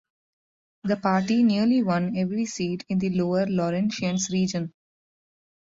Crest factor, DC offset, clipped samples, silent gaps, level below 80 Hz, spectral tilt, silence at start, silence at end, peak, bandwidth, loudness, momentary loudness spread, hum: 16 dB; under 0.1%; under 0.1%; none; -62 dBFS; -6 dB/octave; 0.85 s; 1.05 s; -10 dBFS; 7.8 kHz; -24 LUFS; 8 LU; none